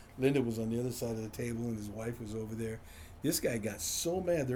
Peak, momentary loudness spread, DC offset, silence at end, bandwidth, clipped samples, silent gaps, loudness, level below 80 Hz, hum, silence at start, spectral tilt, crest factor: -18 dBFS; 9 LU; under 0.1%; 0 s; over 20 kHz; under 0.1%; none; -35 LUFS; -56 dBFS; none; 0 s; -5 dB/octave; 18 dB